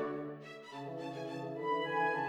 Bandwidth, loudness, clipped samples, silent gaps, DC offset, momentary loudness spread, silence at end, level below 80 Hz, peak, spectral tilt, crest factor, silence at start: 11.5 kHz; -39 LUFS; under 0.1%; none; under 0.1%; 13 LU; 0 s; -82 dBFS; -22 dBFS; -6 dB/octave; 16 dB; 0 s